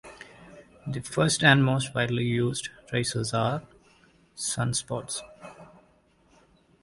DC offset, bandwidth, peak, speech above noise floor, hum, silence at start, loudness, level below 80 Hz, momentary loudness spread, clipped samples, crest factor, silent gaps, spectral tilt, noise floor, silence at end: under 0.1%; 11.5 kHz; -4 dBFS; 37 dB; none; 0.05 s; -26 LUFS; -58 dBFS; 26 LU; under 0.1%; 26 dB; none; -4 dB/octave; -62 dBFS; 1.2 s